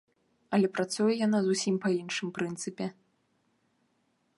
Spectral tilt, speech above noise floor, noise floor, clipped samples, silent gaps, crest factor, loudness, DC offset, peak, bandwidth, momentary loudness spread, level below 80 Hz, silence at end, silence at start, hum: -5 dB/octave; 45 dB; -74 dBFS; under 0.1%; none; 18 dB; -30 LUFS; under 0.1%; -12 dBFS; 11.5 kHz; 9 LU; -78 dBFS; 1.45 s; 0.5 s; none